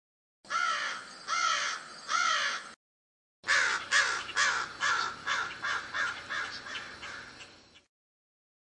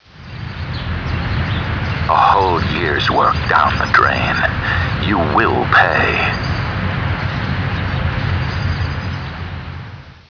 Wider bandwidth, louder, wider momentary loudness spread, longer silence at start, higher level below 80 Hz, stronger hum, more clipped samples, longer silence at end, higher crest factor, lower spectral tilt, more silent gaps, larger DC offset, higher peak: first, 11 kHz vs 5.4 kHz; second, -30 LUFS vs -16 LUFS; about the same, 15 LU vs 14 LU; first, 0.45 s vs 0.15 s; second, -72 dBFS vs -30 dBFS; neither; neither; first, 0.9 s vs 0.1 s; first, 22 dB vs 16 dB; second, 1 dB/octave vs -6.5 dB/octave; first, 2.76-3.43 s vs none; neither; second, -12 dBFS vs 0 dBFS